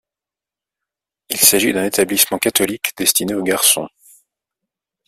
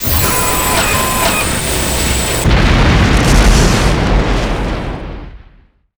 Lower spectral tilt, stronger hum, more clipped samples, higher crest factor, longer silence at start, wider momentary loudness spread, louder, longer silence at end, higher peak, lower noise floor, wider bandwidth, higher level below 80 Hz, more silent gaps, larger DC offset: second, -1.5 dB/octave vs -4 dB/octave; neither; neither; first, 20 dB vs 12 dB; first, 1.3 s vs 0 s; about the same, 8 LU vs 10 LU; second, -15 LUFS vs -12 LUFS; first, 1.2 s vs 0.6 s; about the same, 0 dBFS vs 0 dBFS; first, -88 dBFS vs -45 dBFS; second, 16 kHz vs over 20 kHz; second, -58 dBFS vs -16 dBFS; neither; neither